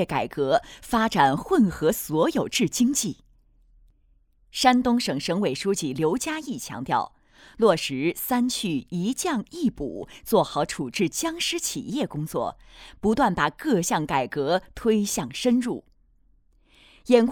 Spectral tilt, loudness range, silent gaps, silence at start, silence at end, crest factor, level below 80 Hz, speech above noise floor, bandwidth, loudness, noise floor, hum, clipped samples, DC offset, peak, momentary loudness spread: -4.5 dB/octave; 3 LU; none; 0 s; 0 s; 20 dB; -52 dBFS; 38 dB; over 20 kHz; -24 LUFS; -62 dBFS; none; under 0.1%; under 0.1%; -4 dBFS; 10 LU